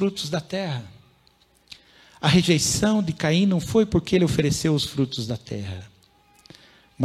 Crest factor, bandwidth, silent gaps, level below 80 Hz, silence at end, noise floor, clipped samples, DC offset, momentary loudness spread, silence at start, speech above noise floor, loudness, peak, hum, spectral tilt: 20 dB; 15 kHz; none; -46 dBFS; 0 s; -60 dBFS; under 0.1%; under 0.1%; 12 LU; 0 s; 38 dB; -22 LUFS; -4 dBFS; none; -5 dB/octave